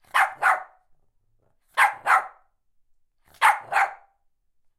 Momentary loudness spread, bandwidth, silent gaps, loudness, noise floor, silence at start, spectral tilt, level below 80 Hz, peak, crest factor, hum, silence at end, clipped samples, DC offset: 8 LU; 16 kHz; none; -22 LUFS; -67 dBFS; 0.15 s; 1 dB/octave; -72 dBFS; -4 dBFS; 22 dB; none; 0.85 s; under 0.1%; under 0.1%